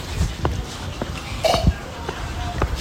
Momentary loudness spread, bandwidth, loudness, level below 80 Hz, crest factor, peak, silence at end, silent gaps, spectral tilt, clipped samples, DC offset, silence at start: 10 LU; 16.5 kHz; -25 LUFS; -28 dBFS; 20 dB; -4 dBFS; 0 s; none; -5 dB/octave; under 0.1%; under 0.1%; 0 s